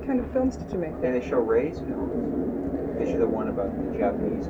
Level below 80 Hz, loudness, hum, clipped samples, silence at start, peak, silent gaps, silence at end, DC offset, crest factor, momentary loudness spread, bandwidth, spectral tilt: -42 dBFS; -27 LUFS; none; under 0.1%; 0 s; -10 dBFS; none; 0 s; under 0.1%; 16 dB; 5 LU; 7.8 kHz; -8.5 dB/octave